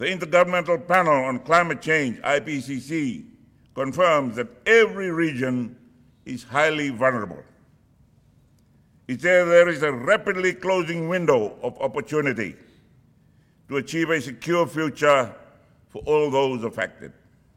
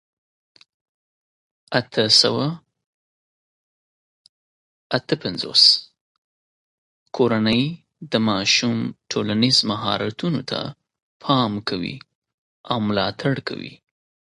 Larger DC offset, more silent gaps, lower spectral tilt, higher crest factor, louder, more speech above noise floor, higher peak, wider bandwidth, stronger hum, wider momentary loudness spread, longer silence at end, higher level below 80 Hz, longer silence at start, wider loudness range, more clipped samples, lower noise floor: neither; second, none vs 2.86-4.90 s, 6.01-7.06 s, 11.02-11.20 s, 12.15-12.22 s, 12.34-12.64 s; about the same, -5 dB/octave vs -4 dB/octave; about the same, 20 dB vs 24 dB; second, -22 LUFS vs -19 LUFS; second, 36 dB vs over 69 dB; second, -4 dBFS vs 0 dBFS; first, 15.5 kHz vs 11.5 kHz; neither; second, 12 LU vs 17 LU; about the same, 0.45 s vs 0.55 s; about the same, -60 dBFS vs -58 dBFS; second, 0 s vs 1.7 s; about the same, 5 LU vs 5 LU; neither; second, -58 dBFS vs under -90 dBFS